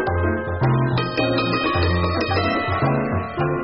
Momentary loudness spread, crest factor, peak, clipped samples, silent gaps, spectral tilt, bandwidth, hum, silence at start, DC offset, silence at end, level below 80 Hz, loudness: 3 LU; 12 dB; -8 dBFS; under 0.1%; none; -5 dB/octave; 5.8 kHz; none; 0 s; 0.3%; 0 s; -38 dBFS; -21 LUFS